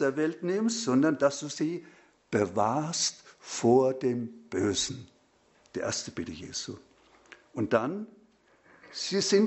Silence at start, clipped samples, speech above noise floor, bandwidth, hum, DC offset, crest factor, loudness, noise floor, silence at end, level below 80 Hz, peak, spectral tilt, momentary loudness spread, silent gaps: 0 s; under 0.1%; 36 dB; 8.2 kHz; none; under 0.1%; 22 dB; -29 LUFS; -65 dBFS; 0 s; -66 dBFS; -8 dBFS; -4 dB/octave; 17 LU; none